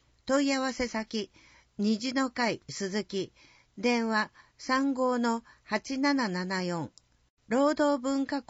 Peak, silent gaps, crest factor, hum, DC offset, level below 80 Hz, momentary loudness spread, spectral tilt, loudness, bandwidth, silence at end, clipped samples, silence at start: -14 dBFS; 7.30-7.37 s; 16 dB; none; under 0.1%; -64 dBFS; 10 LU; -3.5 dB/octave; -30 LUFS; 8 kHz; 0.1 s; under 0.1%; 0.25 s